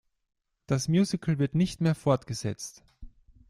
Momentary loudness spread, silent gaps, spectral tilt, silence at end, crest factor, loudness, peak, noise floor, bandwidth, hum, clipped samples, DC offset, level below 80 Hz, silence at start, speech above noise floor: 10 LU; none; -6.5 dB/octave; 0.4 s; 18 dB; -28 LUFS; -12 dBFS; -48 dBFS; 13 kHz; none; under 0.1%; under 0.1%; -54 dBFS; 0.7 s; 21 dB